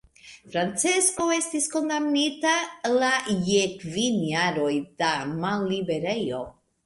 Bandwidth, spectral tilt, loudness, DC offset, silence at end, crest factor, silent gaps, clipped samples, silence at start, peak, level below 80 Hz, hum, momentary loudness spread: 11.5 kHz; -3 dB/octave; -25 LUFS; under 0.1%; 0.35 s; 18 dB; none; under 0.1%; 0.25 s; -8 dBFS; -62 dBFS; none; 6 LU